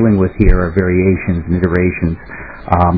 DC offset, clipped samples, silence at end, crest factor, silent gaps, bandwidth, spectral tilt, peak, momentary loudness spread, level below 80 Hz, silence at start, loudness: 0.9%; 0.3%; 0 s; 12 dB; none; 4.9 kHz; -12 dB/octave; 0 dBFS; 10 LU; -20 dBFS; 0 s; -14 LUFS